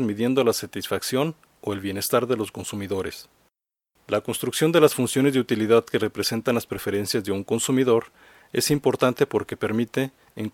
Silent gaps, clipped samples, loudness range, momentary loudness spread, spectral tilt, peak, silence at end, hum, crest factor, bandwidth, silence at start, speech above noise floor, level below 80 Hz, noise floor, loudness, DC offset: none; under 0.1%; 5 LU; 10 LU; -4.5 dB/octave; -2 dBFS; 0.05 s; none; 22 dB; 17.5 kHz; 0 s; 51 dB; -60 dBFS; -74 dBFS; -23 LUFS; under 0.1%